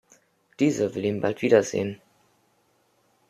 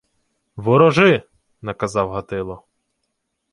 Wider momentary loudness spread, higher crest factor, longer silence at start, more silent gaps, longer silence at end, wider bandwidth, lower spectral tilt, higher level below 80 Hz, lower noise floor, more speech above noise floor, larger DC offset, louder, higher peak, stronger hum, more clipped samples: second, 11 LU vs 19 LU; about the same, 22 dB vs 18 dB; about the same, 0.6 s vs 0.55 s; neither; first, 1.35 s vs 0.95 s; first, 13.5 kHz vs 11.5 kHz; about the same, -5.5 dB/octave vs -6.5 dB/octave; second, -68 dBFS vs -50 dBFS; second, -67 dBFS vs -74 dBFS; second, 43 dB vs 57 dB; neither; second, -24 LUFS vs -17 LUFS; second, -6 dBFS vs -2 dBFS; neither; neither